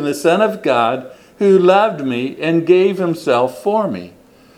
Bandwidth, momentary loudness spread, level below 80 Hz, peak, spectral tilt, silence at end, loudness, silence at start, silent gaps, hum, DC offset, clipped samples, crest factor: 15 kHz; 9 LU; -62 dBFS; 0 dBFS; -6 dB/octave; 0.5 s; -15 LUFS; 0 s; none; none; under 0.1%; under 0.1%; 16 dB